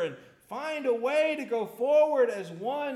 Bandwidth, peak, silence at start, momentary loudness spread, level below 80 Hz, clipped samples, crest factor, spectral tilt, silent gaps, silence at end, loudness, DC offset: 13.5 kHz; -14 dBFS; 0 s; 12 LU; -80 dBFS; under 0.1%; 14 dB; -5 dB/octave; none; 0 s; -28 LUFS; under 0.1%